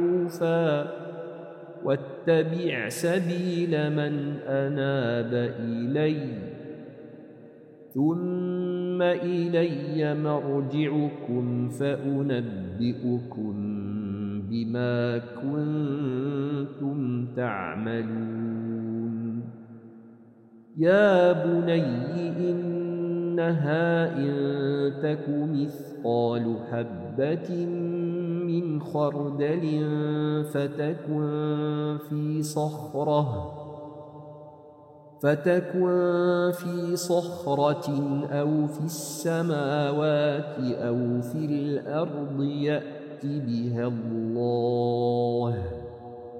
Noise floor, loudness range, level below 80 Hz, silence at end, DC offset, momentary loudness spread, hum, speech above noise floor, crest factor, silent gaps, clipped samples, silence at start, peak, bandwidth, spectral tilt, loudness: -52 dBFS; 5 LU; -66 dBFS; 0 s; under 0.1%; 9 LU; none; 26 dB; 18 dB; none; under 0.1%; 0 s; -8 dBFS; 16 kHz; -7 dB/octave; -27 LUFS